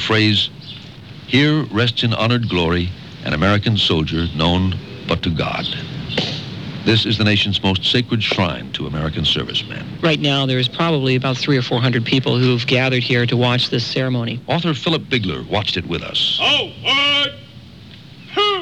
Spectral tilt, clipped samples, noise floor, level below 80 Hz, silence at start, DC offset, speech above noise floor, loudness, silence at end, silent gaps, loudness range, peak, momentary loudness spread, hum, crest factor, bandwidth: -5.5 dB/octave; under 0.1%; -39 dBFS; -42 dBFS; 0 s; 0.2%; 22 dB; -17 LUFS; 0 s; none; 2 LU; -2 dBFS; 9 LU; none; 16 dB; 9.6 kHz